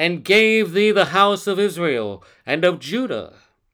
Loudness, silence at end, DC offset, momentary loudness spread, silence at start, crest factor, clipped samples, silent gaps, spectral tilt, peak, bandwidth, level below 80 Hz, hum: -18 LUFS; 0.45 s; under 0.1%; 12 LU; 0 s; 16 dB; under 0.1%; none; -4.5 dB/octave; -2 dBFS; 19.5 kHz; -64 dBFS; none